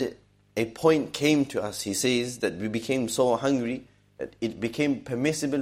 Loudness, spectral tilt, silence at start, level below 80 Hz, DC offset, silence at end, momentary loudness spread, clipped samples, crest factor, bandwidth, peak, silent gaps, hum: -27 LUFS; -4.5 dB/octave; 0 s; -62 dBFS; under 0.1%; 0 s; 10 LU; under 0.1%; 20 dB; 16 kHz; -8 dBFS; none; 50 Hz at -60 dBFS